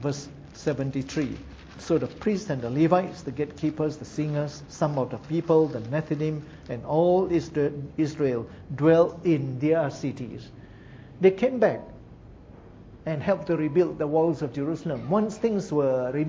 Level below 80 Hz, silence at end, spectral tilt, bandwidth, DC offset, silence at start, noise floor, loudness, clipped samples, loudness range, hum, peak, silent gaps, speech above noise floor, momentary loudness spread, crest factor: -54 dBFS; 0 s; -7.5 dB/octave; 7.8 kHz; under 0.1%; 0 s; -47 dBFS; -26 LUFS; under 0.1%; 3 LU; none; -6 dBFS; none; 22 dB; 14 LU; 20 dB